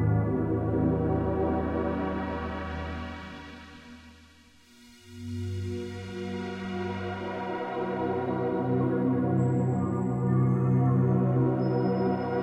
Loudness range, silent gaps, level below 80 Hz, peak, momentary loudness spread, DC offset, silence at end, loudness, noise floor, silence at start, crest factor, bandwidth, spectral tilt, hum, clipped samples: 13 LU; none; -46 dBFS; -14 dBFS; 14 LU; under 0.1%; 0 s; -28 LUFS; -56 dBFS; 0 s; 14 dB; 8.2 kHz; -9 dB/octave; none; under 0.1%